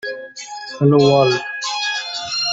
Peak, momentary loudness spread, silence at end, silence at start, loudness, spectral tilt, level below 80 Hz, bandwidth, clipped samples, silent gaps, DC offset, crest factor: -2 dBFS; 18 LU; 0 s; 0.05 s; -17 LUFS; -5 dB/octave; -58 dBFS; 8 kHz; under 0.1%; none; under 0.1%; 16 dB